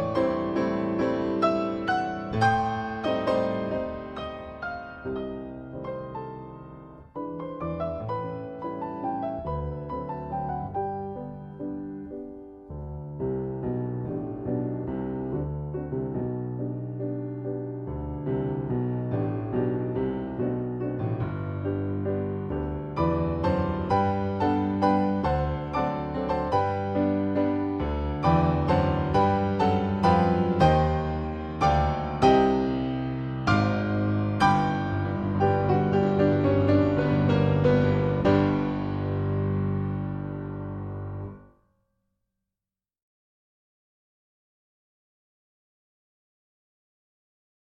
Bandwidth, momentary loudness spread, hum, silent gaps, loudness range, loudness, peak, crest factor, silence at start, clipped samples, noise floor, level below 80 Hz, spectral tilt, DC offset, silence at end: 9 kHz; 13 LU; none; none; 11 LU; -27 LUFS; -8 dBFS; 20 dB; 0 s; under 0.1%; under -90 dBFS; -42 dBFS; -8.5 dB/octave; under 0.1%; 6.3 s